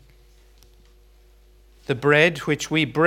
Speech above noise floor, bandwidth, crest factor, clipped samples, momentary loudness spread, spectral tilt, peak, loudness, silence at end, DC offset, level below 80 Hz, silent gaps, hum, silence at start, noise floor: 33 dB; 16 kHz; 22 dB; under 0.1%; 12 LU; -5 dB/octave; -2 dBFS; -20 LUFS; 0 s; under 0.1%; -52 dBFS; none; 50 Hz at -45 dBFS; 1.9 s; -53 dBFS